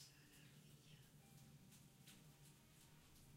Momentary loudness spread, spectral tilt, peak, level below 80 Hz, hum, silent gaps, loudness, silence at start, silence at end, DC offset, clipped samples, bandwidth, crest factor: 3 LU; -3.5 dB/octave; -50 dBFS; -80 dBFS; none; none; -66 LUFS; 0 s; 0 s; under 0.1%; under 0.1%; 16 kHz; 18 dB